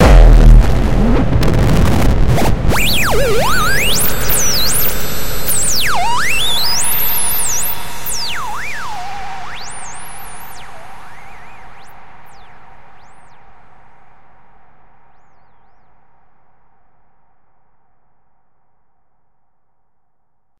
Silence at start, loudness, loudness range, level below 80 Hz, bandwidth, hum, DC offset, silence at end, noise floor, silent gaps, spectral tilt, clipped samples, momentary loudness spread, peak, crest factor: 0 s; -14 LUFS; 19 LU; -18 dBFS; 16.5 kHz; none; 7%; 0 s; -69 dBFS; none; -3.5 dB/octave; under 0.1%; 20 LU; 0 dBFS; 14 dB